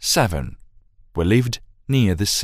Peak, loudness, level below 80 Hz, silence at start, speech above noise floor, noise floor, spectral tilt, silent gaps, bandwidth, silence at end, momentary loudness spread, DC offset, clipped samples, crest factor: -4 dBFS; -21 LUFS; -38 dBFS; 0 s; 31 dB; -50 dBFS; -4.5 dB/octave; none; 16 kHz; 0 s; 13 LU; under 0.1%; under 0.1%; 18 dB